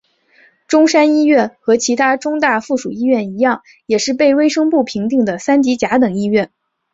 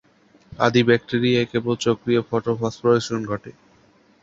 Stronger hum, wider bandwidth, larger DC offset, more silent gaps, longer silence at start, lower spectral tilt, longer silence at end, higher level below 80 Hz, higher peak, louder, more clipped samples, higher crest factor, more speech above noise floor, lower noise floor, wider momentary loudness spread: neither; about the same, 8 kHz vs 8 kHz; neither; neither; first, 0.7 s vs 0.5 s; second, -4.5 dB/octave vs -6 dB/octave; second, 0.45 s vs 0.7 s; about the same, -58 dBFS vs -56 dBFS; about the same, -2 dBFS vs -2 dBFS; first, -14 LUFS vs -21 LUFS; neither; second, 14 dB vs 20 dB; about the same, 38 dB vs 36 dB; second, -52 dBFS vs -56 dBFS; about the same, 6 LU vs 8 LU